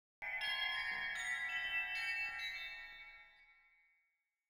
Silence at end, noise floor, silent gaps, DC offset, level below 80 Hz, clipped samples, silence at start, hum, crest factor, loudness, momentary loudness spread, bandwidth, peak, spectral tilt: 0.95 s; -85 dBFS; none; under 0.1%; -72 dBFS; under 0.1%; 0.2 s; none; 16 dB; -39 LUFS; 14 LU; over 20 kHz; -28 dBFS; 1 dB/octave